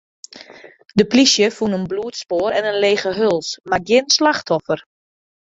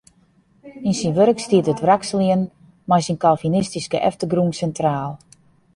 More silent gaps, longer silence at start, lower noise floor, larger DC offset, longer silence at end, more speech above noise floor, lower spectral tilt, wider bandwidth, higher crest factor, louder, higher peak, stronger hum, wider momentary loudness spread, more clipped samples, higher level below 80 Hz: neither; second, 0.35 s vs 0.65 s; second, -41 dBFS vs -57 dBFS; neither; first, 0.75 s vs 0.6 s; second, 24 dB vs 39 dB; second, -3.5 dB/octave vs -6 dB/octave; second, 7.8 kHz vs 11.5 kHz; about the same, 18 dB vs 18 dB; about the same, -17 LUFS vs -19 LUFS; about the same, -2 dBFS vs -2 dBFS; neither; about the same, 12 LU vs 10 LU; neither; about the same, -56 dBFS vs -54 dBFS